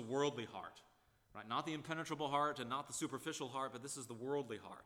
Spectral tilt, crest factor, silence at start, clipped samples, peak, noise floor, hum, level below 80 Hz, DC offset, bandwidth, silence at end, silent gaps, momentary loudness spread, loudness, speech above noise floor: -4 dB/octave; 20 dB; 0 s; under 0.1%; -24 dBFS; -72 dBFS; none; -80 dBFS; under 0.1%; 18 kHz; 0 s; none; 11 LU; -43 LUFS; 30 dB